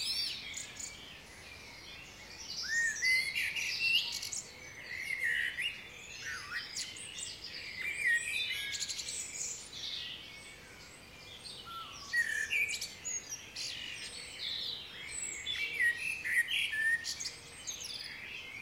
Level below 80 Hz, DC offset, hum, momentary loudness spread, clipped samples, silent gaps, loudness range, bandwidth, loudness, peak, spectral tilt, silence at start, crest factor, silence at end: -66 dBFS; under 0.1%; none; 18 LU; under 0.1%; none; 5 LU; 16 kHz; -35 LUFS; -20 dBFS; 1 dB/octave; 0 s; 18 dB; 0 s